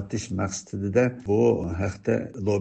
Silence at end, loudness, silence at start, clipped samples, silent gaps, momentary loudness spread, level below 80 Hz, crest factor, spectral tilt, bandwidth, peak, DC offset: 0 s; -25 LUFS; 0 s; under 0.1%; none; 8 LU; -54 dBFS; 16 dB; -6.5 dB/octave; 8.8 kHz; -8 dBFS; under 0.1%